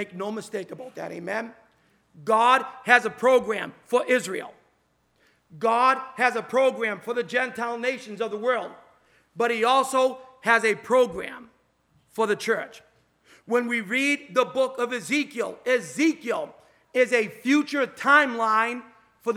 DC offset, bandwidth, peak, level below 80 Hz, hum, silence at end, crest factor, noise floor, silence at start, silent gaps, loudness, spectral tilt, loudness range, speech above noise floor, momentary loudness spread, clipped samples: under 0.1%; 15.5 kHz; 0 dBFS; -72 dBFS; none; 0 s; 24 dB; -68 dBFS; 0 s; none; -24 LUFS; -3.5 dB/octave; 3 LU; 44 dB; 15 LU; under 0.1%